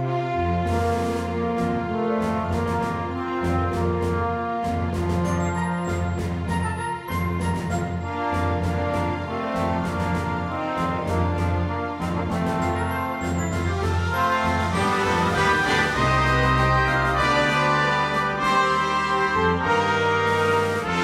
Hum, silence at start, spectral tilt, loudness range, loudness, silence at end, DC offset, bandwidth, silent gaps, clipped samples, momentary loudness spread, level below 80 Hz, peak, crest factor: none; 0 s; -6 dB/octave; 6 LU; -23 LUFS; 0 s; under 0.1%; 14 kHz; none; under 0.1%; 7 LU; -38 dBFS; -8 dBFS; 14 dB